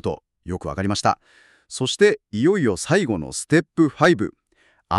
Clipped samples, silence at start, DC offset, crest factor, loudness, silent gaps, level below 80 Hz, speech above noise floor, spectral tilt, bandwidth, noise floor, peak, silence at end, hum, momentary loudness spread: under 0.1%; 0.05 s; under 0.1%; 18 dB; -21 LUFS; none; -50 dBFS; 41 dB; -5 dB/octave; 12.5 kHz; -61 dBFS; -4 dBFS; 0 s; none; 12 LU